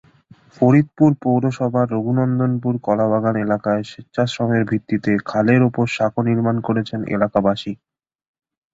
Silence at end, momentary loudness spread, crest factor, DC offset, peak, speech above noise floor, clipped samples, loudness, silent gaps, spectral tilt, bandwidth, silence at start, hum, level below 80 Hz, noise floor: 1 s; 7 LU; 16 dB; under 0.1%; -2 dBFS; 32 dB; under 0.1%; -19 LUFS; none; -8 dB/octave; 7.8 kHz; 0.6 s; none; -54 dBFS; -50 dBFS